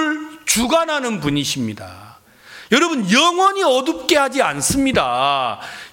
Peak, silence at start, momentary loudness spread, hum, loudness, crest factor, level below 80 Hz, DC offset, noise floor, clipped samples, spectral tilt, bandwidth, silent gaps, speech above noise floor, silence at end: 0 dBFS; 0 s; 10 LU; none; -17 LUFS; 18 dB; -46 dBFS; under 0.1%; -43 dBFS; under 0.1%; -3 dB/octave; 17 kHz; none; 26 dB; 0.05 s